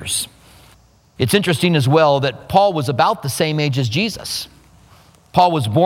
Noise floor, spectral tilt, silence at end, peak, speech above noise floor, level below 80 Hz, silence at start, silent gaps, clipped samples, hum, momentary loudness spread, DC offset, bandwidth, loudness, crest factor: -50 dBFS; -5 dB/octave; 0 s; 0 dBFS; 34 dB; -50 dBFS; 0 s; none; under 0.1%; none; 10 LU; under 0.1%; 16.5 kHz; -17 LUFS; 18 dB